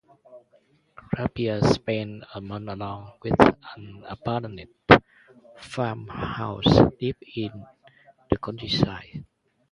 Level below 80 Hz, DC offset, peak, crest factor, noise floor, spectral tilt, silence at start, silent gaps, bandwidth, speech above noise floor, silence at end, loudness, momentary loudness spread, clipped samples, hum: -44 dBFS; under 0.1%; 0 dBFS; 26 dB; -62 dBFS; -6.5 dB/octave; 0.35 s; none; 11 kHz; 37 dB; 0.5 s; -24 LUFS; 21 LU; under 0.1%; none